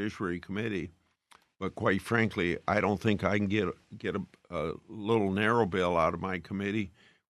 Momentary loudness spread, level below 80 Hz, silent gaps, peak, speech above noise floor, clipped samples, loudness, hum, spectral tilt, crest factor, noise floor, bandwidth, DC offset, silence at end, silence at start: 11 LU; -62 dBFS; none; -10 dBFS; 33 dB; under 0.1%; -31 LUFS; none; -6.5 dB/octave; 20 dB; -64 dBFS; 13 kHz; under 0.1%; 0.4 s; 0 s